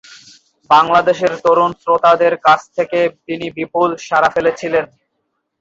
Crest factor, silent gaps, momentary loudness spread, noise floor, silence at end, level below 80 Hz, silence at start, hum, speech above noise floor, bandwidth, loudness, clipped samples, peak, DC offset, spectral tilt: 14 dB; none; 9 LU; -71 dBFS; 0.75 s; -56 dBFS; 0.7 s; none; 57 dB; 7.8 kHz; -14 LUFS; under 0.1%; 0 dBFS; under 0.1%; -5 dB/octave